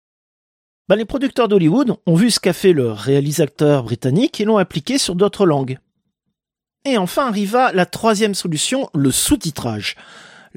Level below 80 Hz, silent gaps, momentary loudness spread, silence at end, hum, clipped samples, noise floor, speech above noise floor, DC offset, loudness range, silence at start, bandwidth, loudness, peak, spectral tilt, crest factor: -46 dBFS; none; 7 LU; 0.35 s; none; under 0.1%; -85 dBFS; 68 dB; under 0.1%; 3 LU; 0.9 s; 16.5 kHz; -17 LUFS; -2 dBFS; -5 dB/octave; 16 dB